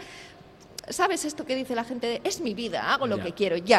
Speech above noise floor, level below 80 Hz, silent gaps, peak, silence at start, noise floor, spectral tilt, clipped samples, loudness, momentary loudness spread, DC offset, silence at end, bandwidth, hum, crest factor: 23 dB; -62 dBFS; none; -6 dBFS; 0 s; -50 dBFS; -3.5 dB/octave; under 0.1%; -28 LUFS; 17 LU; under 0.1%; 0 s; 16 kHz; none; 22 dB